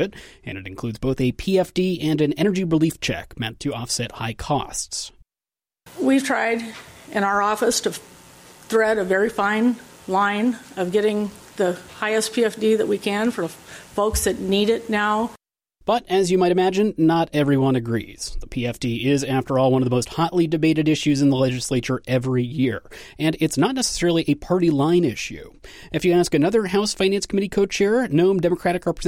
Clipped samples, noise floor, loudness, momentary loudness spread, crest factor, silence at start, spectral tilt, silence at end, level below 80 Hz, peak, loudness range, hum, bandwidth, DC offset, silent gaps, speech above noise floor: under 0.1%; under -90 dBFS; -21 LUFS; 11 LU; 14 dB; 0 s; -5 dB/octave; 0 s; -44 dBFS; -8 dBFS; 3 LU; none; 16.5 kHz; under 0.1%; none; over 69 dB